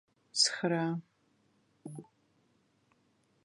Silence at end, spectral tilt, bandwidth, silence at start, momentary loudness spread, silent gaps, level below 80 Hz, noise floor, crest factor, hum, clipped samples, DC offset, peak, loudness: 1.4 s; -3 dB/octave; 11.5 kHz; 0.35 s; 22 LU; none; -86 dBFS; -72 dBFS; 24 dB; none; under 0.1%; under 0.1%; -14 dBFS; -31 LUFS